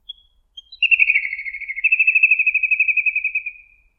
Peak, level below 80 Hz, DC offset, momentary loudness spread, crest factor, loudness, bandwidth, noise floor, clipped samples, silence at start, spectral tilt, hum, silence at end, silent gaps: -2 dBFS; -60 dBFS; under 0.1%; 13 LU; 18 dB; -15 LUFS; 5.8 kHz; -46 dBFS; under 0.1%; 0.1 s; 2 dB/octave; none; 0.45 s; none